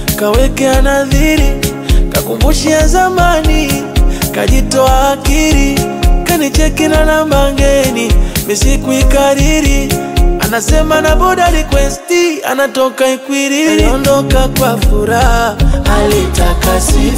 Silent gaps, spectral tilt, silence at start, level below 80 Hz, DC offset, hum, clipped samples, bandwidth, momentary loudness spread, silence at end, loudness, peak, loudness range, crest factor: none; -4.5 dB/octave; 0 s; -14 dBFS; 0.2%; none; under 0.1%; 16.5 kHz; 4 LU; 0 s; -11 LUFS; 0 dBFS; 1 LU; 10 dB